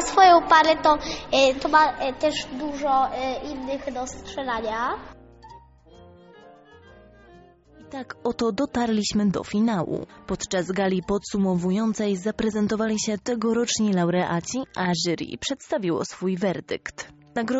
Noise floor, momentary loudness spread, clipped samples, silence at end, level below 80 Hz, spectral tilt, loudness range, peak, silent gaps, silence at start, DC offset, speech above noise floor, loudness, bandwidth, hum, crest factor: -51 dBFS; 13 LU; under 0.1%; 0 s; -50 dBFS; -4 dB/octave; 11 LU; -4 dBFS; none; 0 s; under 0.1%; 27 dB; -23 LUFS; 8 kHz; none; 20 dB